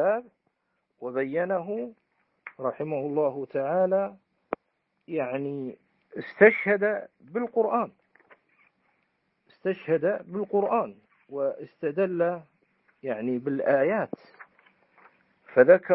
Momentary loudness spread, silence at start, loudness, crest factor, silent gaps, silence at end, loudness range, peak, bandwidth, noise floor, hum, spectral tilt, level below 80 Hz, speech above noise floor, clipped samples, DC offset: 17 LU; 0 s; -27 LUFS; 24 dB; none; 0 s; 5 LU; -4 dBFS; 4.9 kHz; -77 dBFS; none; -11 dB/octave; -78 dBFS; 51 dB; under 0.1%; under 0.1%